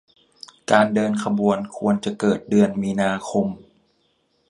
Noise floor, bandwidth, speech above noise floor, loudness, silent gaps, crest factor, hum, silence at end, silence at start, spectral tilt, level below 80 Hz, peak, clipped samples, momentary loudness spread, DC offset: -66 dBFS; 11 kHz; 46 dB; -21 LUFS; none; 22 dB; none; 0.95 s; 0.7 s; -6 dB/octave; -58 dBFS; 0 dBFS; under 0.1%; 6 LU; under 0.1%